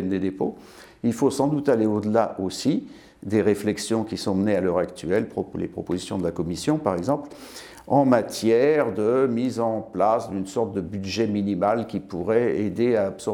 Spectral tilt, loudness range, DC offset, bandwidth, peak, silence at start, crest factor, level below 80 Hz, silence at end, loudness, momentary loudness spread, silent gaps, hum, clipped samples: -6 dB/octave; 3 LU; under 0.1%; 17.5 kHz; -4 dBFS; 0 s; 18 dB; -56 dBFS; 0 s; -24 LUFS; 9 LU; none; none; under 0.1%